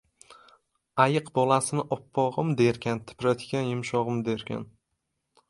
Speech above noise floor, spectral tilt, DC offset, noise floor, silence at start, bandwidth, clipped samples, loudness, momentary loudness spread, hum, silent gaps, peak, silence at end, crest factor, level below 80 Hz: 54 dB; -5.5 dB/octave; under 0.1%; -80 dBFS; 0.3 s; 11.5 kHz; under 0.1%; -27 LUFS; 9 LU; none; none; -4 dBFS; 0.85 s; 24 dB; -64 dBFS